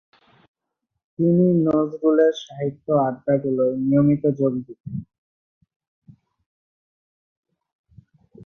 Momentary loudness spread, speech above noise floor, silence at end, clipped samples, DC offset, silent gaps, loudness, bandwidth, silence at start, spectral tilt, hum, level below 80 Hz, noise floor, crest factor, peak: 14 LU; 60 dB; 0 s; under 0.1%; under 0.1%; 4.80-4.84 s, 5.18-5.61 s, 5.76-5.80 s, 5.88-6.02 s, 6.46-7.43 s, 7.72-7.84 s; -20 LUFS; 6.6 kHz; 1.2 s; -9 dB/octave; none; -60 dBFS; -80 dBFS; 16 dB; -6 dBFS